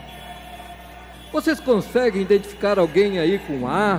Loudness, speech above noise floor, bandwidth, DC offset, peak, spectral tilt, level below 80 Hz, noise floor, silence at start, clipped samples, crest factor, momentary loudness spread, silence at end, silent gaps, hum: -20 LUFS; 21 dB; over 20 kHz; under 0.1%; -6 dBFS; -6 dB/octave; -46 dBFS; -40 dBFS; 0 s; under 0.1%; 14 dB; 20 LU; 0 s; none; none